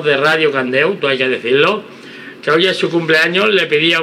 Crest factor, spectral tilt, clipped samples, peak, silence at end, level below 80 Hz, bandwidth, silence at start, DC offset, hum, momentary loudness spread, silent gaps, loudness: 14 dB; -4.5 dB/octave; under 0.1%; 0 dBFS; 0 s; -76 dBFS; 14.5 kHz; 0 s; under 0.1%; none; 11 LU; none; -13 LUFS